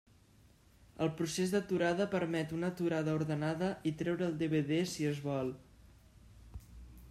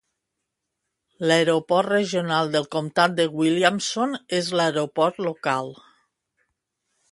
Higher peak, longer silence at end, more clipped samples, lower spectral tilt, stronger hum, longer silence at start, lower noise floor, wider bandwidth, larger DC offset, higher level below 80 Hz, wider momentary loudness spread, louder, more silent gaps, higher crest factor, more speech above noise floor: second, -20 dBFS vs -4 dBFS; second, 0 s vs 1.4 s; neither; first, -6 dB/octave vs -4.5 dB/octave; neither; second, 0.95 s vs 1.2 s; second, -64 dBFS vs -81 dBFS; first, 14.5 kHz vs 11.5 kHz; neither; first, -62 dBFS vs -70 dBFS; first, 20 LU vs 6 LU; second, -35 LUFS vs -22 LUFS; neither; about the same, 16 dB vs 20 dB; second, 30 dB vs 59 dB